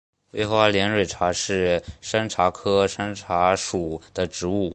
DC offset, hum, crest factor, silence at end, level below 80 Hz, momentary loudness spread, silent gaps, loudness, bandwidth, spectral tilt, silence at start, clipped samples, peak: under 0.1%; none; 20 dB; 0 s; -46 dBFS; 9 LU; none; -23 LUFS; 10 kHz; -4 dB/octave; 0.35 s; under 0.1%; -2 dBFS